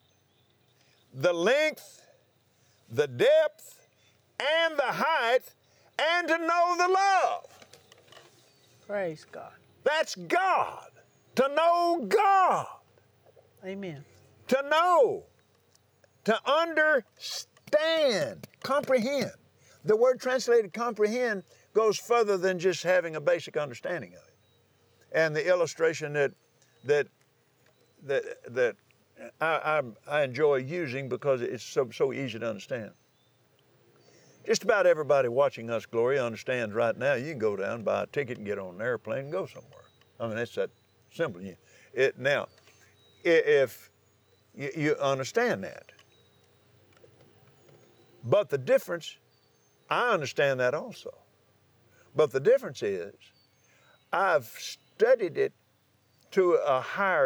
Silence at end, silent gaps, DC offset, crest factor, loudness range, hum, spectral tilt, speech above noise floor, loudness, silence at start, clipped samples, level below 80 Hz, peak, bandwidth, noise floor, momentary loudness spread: 0 s; none; under 0.1%; 18 dB; 6 LU; none; -4.5 dB/octave; 40 dB; -28 LUFS; 1.15 s; under 0.1%; -86 dBFS; -10 dBFS; over 20 kHz; -67 dBFS; 15 LU